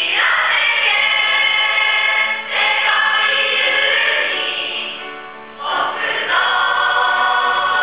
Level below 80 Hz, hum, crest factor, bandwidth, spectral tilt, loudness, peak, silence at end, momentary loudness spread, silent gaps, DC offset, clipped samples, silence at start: -68 dBFS; none; 14 dB; 4 kHz; -3 dB/octave; -14 LUFS; -2 dBFS; 0 s; 9 LU; none; 0.4%; under 0.1%; 0 s